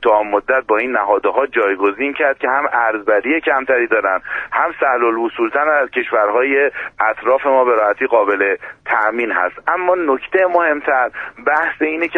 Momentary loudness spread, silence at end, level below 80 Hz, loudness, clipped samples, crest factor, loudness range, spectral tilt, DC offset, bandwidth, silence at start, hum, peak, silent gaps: 4 LU; 0 s; -56 dBFS; -16 LUFS; under 0.1%; 16 dB; 1 LU; -6 dB/octave; under 0.1%; 4 kHz; 0 s; none; 0 dBFS; none